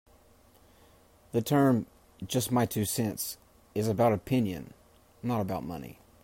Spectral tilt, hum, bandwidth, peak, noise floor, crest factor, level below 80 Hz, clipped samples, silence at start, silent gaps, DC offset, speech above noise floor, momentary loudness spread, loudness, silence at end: -5.5 dB/octave; none; 16.5 kHz; -14 dBFS; -60 dBFS; 18 dB; -62 dBFS; under 0.1%; 1.35 s; none; under 0.1%; 32 dB; 19 LU; -30 LUFS; 0.3 s